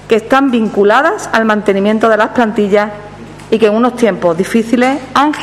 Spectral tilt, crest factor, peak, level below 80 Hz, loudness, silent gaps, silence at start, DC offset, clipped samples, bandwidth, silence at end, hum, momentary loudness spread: -5.5 dB/octave; 12 dB; 0 dBFS; -46 dBFS; -11 LUFS; none; 0 s; under 0.1%; 0.4%; 14 kHz; 0 s; 50 Hz at -40 dBFS; 4 LU